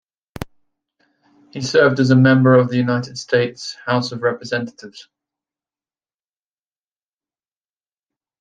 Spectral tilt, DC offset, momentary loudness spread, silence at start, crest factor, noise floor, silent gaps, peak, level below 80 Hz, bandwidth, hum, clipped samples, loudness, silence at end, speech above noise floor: -6.5 dB/octave; under 0.1%; 22 LU; 0.4 s; 18 dB; under -90 dBFS; none; -2 dBFS; -56 dBFS; 9.2 kHz; none; under 0.1%; -17 LUFS; 3.4 s; over 74 dB